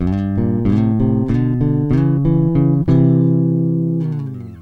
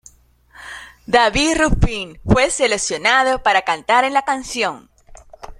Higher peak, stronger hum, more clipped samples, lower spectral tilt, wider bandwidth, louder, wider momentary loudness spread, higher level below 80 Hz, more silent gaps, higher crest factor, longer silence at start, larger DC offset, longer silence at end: second, -4 dBFS vs 0 dBFS; neither; neither; first, -11.5 dB/octave vs -3.5 dB/octave; second, 4.5 kHz vs 13 kHz; about the same, -16 LUFS vs -17 LUFS; second, 6 LU vs 17 LU; about the same, -34 dBFS vs -30 dBFS; neither; second, 12 dB vs 18 dB; second, 0 s vs 0.6 s; neither; about the same, 0 s vs 0.05 s